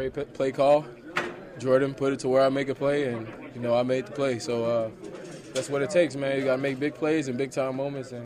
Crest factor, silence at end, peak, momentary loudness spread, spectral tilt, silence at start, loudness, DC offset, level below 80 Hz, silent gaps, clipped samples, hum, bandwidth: 16 dB; 0 s; -10 dBFS; 11 LU; -5.5 dB/octave; 0 s; -27 LUFS; under 0.1%; -62 dBFS; none; under 0.1%; none; 12.5 kHz